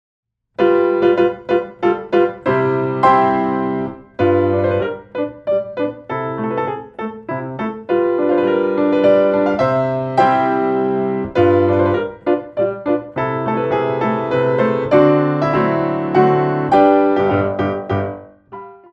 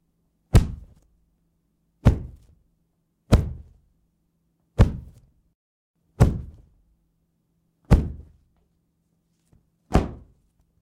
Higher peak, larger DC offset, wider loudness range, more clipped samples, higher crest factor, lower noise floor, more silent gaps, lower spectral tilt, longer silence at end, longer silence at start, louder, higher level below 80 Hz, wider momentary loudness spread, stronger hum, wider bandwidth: first, 0 dBFS vs -6 dBFS; neither; about the same, 5 LU vs 3 LU; neither; about the same, 16 dB vs 20 dB; second, -36 dBFS vs -71 dBFS; second, none vs 5.55-5.94 s; first, -9 dB/octave vs -7.5 dB/octave; second, 0.2 s vs 0.65 s; about the same, 0.6 s vs 0.55 s; first, -16 LUFS vs -23 LUFS; second, -52 dBFS vs -30 dBFS; second, 11 LU vs 21 LU; neither; second, 6.6 kHz vs 16.5 kHz